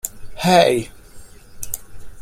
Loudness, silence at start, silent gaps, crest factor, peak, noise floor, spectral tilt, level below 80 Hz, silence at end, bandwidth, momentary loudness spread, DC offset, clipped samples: -18 LUFS; 0.05 s; none; 20 dB; 0 dBFS; -39 dBFS; -4 dB/octave; -42 dBFS; 0 s; 16.5 kHz; 20 LU; under 0.1%; under 0.1%